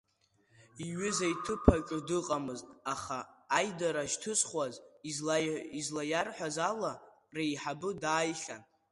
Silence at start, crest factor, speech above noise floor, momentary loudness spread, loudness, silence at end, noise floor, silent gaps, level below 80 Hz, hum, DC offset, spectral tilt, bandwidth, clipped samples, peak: 0.6 s; 30 dB; 38 dB; 11 LU; -34 LUFS; 0.3 s; -72 dBFS; none; -48 dBFS; none; under 0.1%; -4 dB/octave; 11.5 kHz; under 0.1%; -6 dBFS